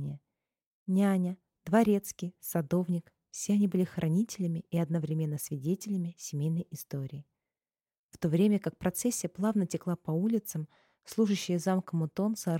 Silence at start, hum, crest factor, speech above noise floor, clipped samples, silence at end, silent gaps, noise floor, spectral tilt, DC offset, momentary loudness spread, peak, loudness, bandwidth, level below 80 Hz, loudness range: 0 s; none; 16 dB; over 60 dB; under 0.1%; 0 s; 0.66-0.86 s, 7.98-8.09 s; under -90 dBFS; -6.5 dB/octave; under 0.1%; 12 LU; -14 dBFS; -31 LUFS; 17 kHz; -68 dBFS; 4 LU